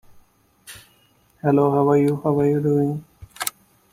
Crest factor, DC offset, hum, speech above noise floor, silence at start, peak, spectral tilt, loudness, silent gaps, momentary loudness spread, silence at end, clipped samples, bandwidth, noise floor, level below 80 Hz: 22 dB; under 0.1%; none; 41 dB; 0.7 s; 0 dBFS; -7 dB/octave; -20 LUFS; none; 20 LU; 0.45 s; under 0.1%; 16.5 kHz; -59 dBFS; -56 dBFS